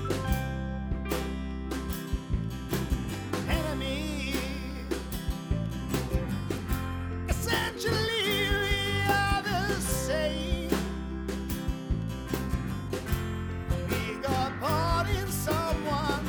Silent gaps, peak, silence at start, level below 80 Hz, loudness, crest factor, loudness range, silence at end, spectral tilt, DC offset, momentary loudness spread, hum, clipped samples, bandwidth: none; -12 dBFS; 0 s; -36 dBFS; -31 LUFS; 18 dB; 5 LU; 0 s; -5 dB/octave; under 0.1%; 8 LU; none; under 0.1%; over 20 kHz